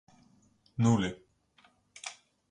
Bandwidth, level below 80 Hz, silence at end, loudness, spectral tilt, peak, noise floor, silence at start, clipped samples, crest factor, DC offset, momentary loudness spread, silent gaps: 10.5 kHz; -62 dBFS; 0.4 s; -32 LUFS; -6 dB/octave; -14 dBFS; -66 dBFS; 0.8 s; under 0.1%; 22 dB; under 0.1%; 17 LU; none